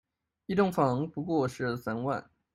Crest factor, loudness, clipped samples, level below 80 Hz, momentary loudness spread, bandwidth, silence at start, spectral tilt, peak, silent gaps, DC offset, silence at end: 18 dB; -30 LUFS; under 0.1%; -64 dBFS; 8 LU; 15.5 kHz; 0.5 s; -7.5 dB/octave; -12 dBFS; none; under 0.1%; 0.3 s